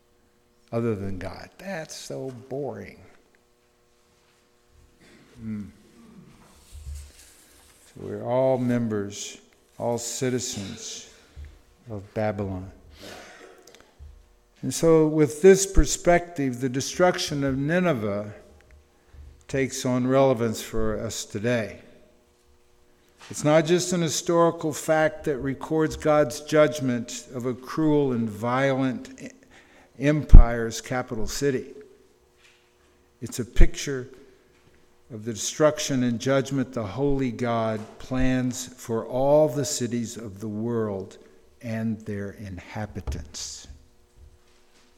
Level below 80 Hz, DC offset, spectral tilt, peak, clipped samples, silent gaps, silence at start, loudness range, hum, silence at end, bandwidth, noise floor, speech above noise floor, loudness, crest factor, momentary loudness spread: -30 dBFS; under 0.1%; -5 dB/octave; 0 dBFS; under 0.1%; none; 0.7 s; 15 LU; none; 1.25 s; 15 kHz; -63 dBFS; 40 dB; -25 LUFS; 24 dB; 20 LU